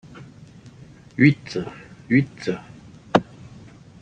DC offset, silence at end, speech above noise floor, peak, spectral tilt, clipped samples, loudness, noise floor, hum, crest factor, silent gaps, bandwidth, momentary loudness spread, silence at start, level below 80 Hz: under 0.1%; 0.8 s; 25 dB; -2 dBFS; -7.5 dB/octave; under 0.1%; -22 LUFS; -46 dBFS; none; 24 dB; none; 9 kHz; 26 LU; 0.2 s; -56 dBFS